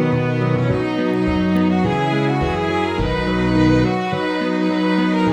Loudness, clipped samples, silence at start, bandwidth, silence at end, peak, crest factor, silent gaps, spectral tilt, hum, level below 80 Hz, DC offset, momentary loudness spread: -18 LUFS; under 0.1%; 0 s; 9.2 kHz; 0 s; -4 dBFS; 14 dB; none; -7.5 dB/octave; none; -34 dBFS; under 0.1%; 4 LU